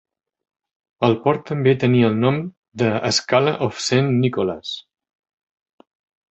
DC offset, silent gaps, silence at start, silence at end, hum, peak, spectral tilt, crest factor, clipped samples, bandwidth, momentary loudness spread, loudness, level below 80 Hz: under 0.1%; 2.57-2.62 s; 1 s; 1.5 s; none; -2 dBFS; -5.5 dB/octave; 18 dB; under 0.1%; 8.2 kHz; 10 LU; -19 LUFS; -56 dBFS